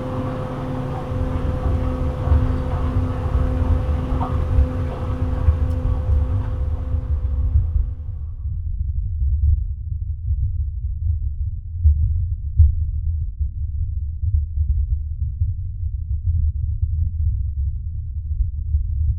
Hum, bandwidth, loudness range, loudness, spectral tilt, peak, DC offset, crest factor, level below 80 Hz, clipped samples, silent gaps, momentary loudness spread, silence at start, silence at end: none; 3.9 kHz; 3 LU; -23 LUFS; -10 dB/octave; -2 dBFS; under 0.1%; 18 dB; -24 dBFS; under 0.1%; none; 8 LU; 0 s; 0 s